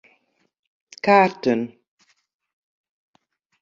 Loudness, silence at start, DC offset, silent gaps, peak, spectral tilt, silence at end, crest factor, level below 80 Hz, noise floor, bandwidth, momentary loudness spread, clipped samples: -19 LUFS; 1.05 s; under 0.1%; none; -2 dBFS; -6 dB/octave; 1.95 s; 22 dB; -70 dBFS; -67 dBFS; 7.6 kHz; 11 LU; under 0.1%